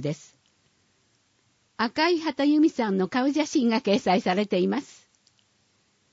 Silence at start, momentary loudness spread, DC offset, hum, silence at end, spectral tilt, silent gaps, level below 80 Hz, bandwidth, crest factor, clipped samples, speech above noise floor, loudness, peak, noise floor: 0 s; 8 LU; under 0.1%; none; 1.3 s; -5.5 dB/octave; none; -72 dBFS; 8 kHz; 16 dB; under 0.1%; 44 dB; -24 LUFS; -10 dBFS; -67 dBFS